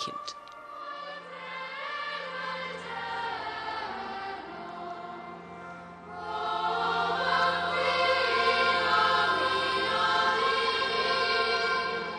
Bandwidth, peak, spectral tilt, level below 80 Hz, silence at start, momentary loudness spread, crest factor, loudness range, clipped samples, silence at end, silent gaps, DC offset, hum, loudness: 10 kHz; -14 dBFS; -3 dB/octave; -66 dBFS; 0 s; 17 LU; 16 dB; 12 LU; under 0.1%; 0 s; none; under 0.1%; none; -27 LUFS